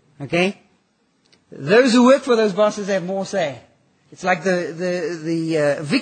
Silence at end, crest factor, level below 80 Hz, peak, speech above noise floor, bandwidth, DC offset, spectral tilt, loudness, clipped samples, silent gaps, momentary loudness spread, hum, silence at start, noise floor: 0 s; 18 dB; -66 dBFS; -2 dBFS; 45 dB; 9.2 kHz; under 0.1%; -5 dB/octave; -19 LUFS; under 0.1%; none; 10 LU; none; 0.2 s; -63 dBFS